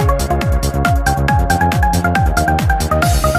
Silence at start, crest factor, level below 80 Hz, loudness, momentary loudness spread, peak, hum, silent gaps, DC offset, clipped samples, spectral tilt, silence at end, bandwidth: 0 s; 12 dB; -18 dBFS; -15 LUFS; 2 LU; -2 dBFS; none; none; 0.3%; under 0.1%; -5.5 dB/octave; 0 s; 16 kHz